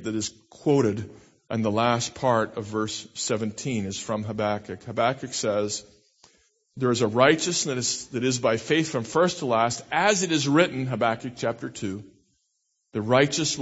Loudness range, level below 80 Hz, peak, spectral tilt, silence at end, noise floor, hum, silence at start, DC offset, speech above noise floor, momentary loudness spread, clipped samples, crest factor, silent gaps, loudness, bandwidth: 5 LU; -62 dBFS; -4 dBFS; -4 dB/octave; 0 s; -75 dBFS; none; 0 s; under 0.1%; 50 dB; 11 LU; under 0.1%; 22 dB; none; -25 LUFS; 8.2 kHz